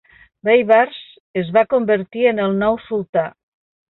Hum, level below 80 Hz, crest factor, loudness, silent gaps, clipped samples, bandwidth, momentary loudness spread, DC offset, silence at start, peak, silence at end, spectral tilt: none; -56 dBFS; 16 dB; -17 LUFS; 1.20-1.34 s, 3.09-3.13 s; under 0.1%; 4.2 kHz; 11 LU; under 0.1%; 0.45 s; -2 dBFS; 0.65 s; -9 dB/octave